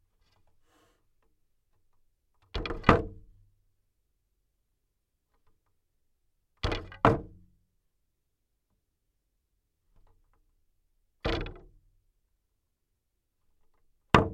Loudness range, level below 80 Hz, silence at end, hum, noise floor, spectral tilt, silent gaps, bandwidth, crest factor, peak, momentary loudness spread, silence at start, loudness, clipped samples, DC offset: 9 LU; -46 dBFS; 0 s; none; -80 dBFS; -6.5 dB/octave; none; 12.5 kHz; 34 dB; 0 dBFS; 15 LU; 2.55 s; -29 LUFS; under 0.1%; under 0.1%